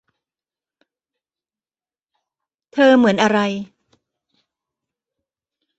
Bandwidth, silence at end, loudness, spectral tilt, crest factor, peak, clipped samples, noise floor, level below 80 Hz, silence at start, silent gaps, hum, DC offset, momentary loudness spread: 8.2 kHz; 2.15 s; -16 LUFS; -5.5 dB/octave; 20 dB; -2 dBFS; under 0.1%; under -90 dBFS; -64 dBFS; 2.75 s; none; none; under 0.1%; 17 LU